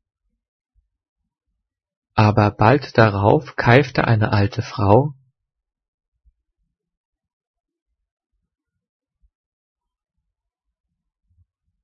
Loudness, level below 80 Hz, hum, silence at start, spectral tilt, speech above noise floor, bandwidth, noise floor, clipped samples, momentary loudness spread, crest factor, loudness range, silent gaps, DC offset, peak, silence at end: -17 LUFS; -50 dBFS; none; 2.15 s; -8 dB/octave; 66 dB; 6.4 kHz; -82 dBFS; under 0.1%; 7 LU; 22 dB; 8 LU; none; under 0.1%; 0 dBFS; 6.7 s